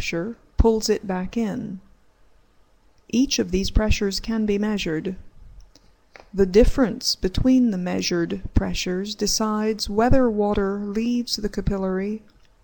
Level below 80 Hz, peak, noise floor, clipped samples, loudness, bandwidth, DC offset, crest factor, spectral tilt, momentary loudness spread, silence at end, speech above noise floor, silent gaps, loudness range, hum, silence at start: -32 dBFS; -2 dBFS; -56 dBFS; under 0.1%; -23 LUFS; 17.5 kHz; under 0.1%; 20 dB; -5 dB/octave; 10 LU; 0.45 s; 35 dB; none; 4 LU; none; 0 s